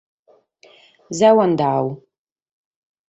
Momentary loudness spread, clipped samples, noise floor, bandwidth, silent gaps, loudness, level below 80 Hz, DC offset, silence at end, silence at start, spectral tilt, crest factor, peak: 17 LU; under 0.1%; -54 dBFS; 8.2 kHz; none; -17 LUFS; -64 dBFS; under 0.1%; 1.1 s; 1.1 s; -6 dB/octave; 18 dB; -2 dBFS